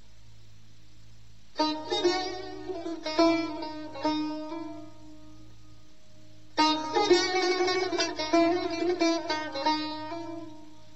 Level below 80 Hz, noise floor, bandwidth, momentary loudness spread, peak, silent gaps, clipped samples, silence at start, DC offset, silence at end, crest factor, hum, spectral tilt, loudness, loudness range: -64 dBFS; -57 dBFS; 8.2 kHz; 14 LU; -10 dBFS; none; under 0.1%; 1.55 s; 0.7%; 0.2 s; 20 dB; none; -3 dB/octave; -28 LUFS; 7 LU